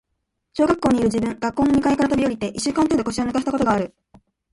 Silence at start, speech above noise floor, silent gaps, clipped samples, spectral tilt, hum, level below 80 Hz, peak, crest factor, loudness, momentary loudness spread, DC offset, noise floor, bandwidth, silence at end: 0.55 s; 56 dB; none; under 0.1%; -5.5 dB/octave; none; -46 dBFS; -4 dBFS; 16 dB; -20 LUFS; 6 LU; under 0.1%; -76 dBFS; 11.5 kHz; 0.65 s